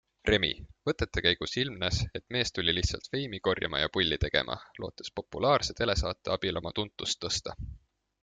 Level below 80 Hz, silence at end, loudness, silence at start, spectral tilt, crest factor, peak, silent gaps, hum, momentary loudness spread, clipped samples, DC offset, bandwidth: -44 dBFS; 0.45 s; -30 LUFS; 0.25 s; -4 dB/octave; 24 dB; -8 dBFS; none; none; 11 LU; under 0.1%; under 0.1%; 9.4 kHz